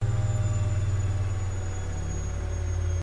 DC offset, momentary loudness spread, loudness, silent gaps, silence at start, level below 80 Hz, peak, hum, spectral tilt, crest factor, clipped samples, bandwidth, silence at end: under 0.1%; 6 LU; -29 LUFS; none; 0 s; -36 dBFS; -16 dBFS; none; -6 dB/octave; 10 dB; under 0.1%; 10.5 kHz; 0 s